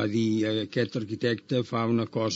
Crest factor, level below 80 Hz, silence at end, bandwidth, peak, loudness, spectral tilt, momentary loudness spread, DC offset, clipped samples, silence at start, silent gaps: 14 dB; -72 dBFS; 0 s; 8 kHz; -12 dBFS; -28 LUFS; -5.5 dB/octave; 3 LU; under 0.1%; under 0.1%; 0 s; none